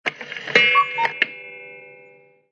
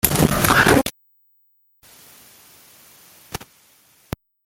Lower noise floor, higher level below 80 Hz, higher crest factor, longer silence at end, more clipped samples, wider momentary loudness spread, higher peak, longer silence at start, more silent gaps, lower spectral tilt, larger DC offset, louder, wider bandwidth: second, -51 dBFS vs -61 dBFS; second, -76 dBFS vs -40 dBFS; about the same, 22 dB vs 22 dB; second, 0.6 s vs 1.1 s; neither; about the same, 23 LU vs 22 LU; about the same, 0 dBFS vs 0 dBFS; about the same, 0.05 s vs 0.05 s; neither; second, -2.5 dB/octave vs -4 dB/octave; neither; about the same, -18 LUFS vs -16 LUFS; second, 10.5 kHz vs 17 kHz